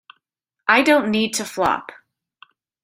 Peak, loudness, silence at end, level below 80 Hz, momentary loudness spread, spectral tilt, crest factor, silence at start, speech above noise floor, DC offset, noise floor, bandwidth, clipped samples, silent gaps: -2 dBFS; -18 LUFS; 1 s; -58 dBFS; 10 LU; -3 dB/octave; 20 dB; 0.65 s; 61 dB; under 0.1%; -80 dBFS; 16 kHz; under 0.1%; none